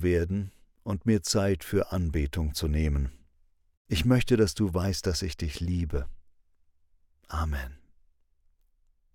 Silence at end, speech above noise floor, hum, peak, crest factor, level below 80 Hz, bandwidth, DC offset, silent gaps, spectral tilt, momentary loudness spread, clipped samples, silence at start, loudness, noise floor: 1.4 s; 39 dB; none; -10 dBFS; 20 dB; -38 dBFS; 17 kHz; under 0.1%; 3.77-3.85 s; -5.5 dB/octave; 12 LU; under 0.1%; 0 s; -29 LUFS; -66 dBFS